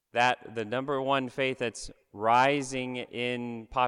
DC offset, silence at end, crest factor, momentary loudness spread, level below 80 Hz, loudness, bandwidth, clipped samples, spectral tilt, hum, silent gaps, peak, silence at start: under 0.1%; 0 s; 18 dB; 11 LU; -58 dBFS; -29 LUFS; 11.5 kHz; under 0.1%; -4.5 dB/octave; none; none; -12 dBFS; 0.15 s